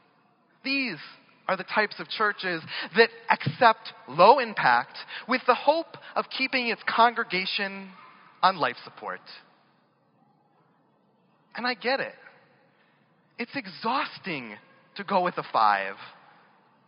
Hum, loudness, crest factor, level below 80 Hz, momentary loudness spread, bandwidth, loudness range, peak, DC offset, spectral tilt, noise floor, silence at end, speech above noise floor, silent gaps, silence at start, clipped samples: none; -25 LUFS; 24 dB; -84 dBFS; 17 LU; 5.6 kHz; 12 LU; -4 dBFS; under 0.1%; -1.5 dB/octave; -66 dBFS; 0.75 s; 40 dB; none; 0.65 s; under 0.1%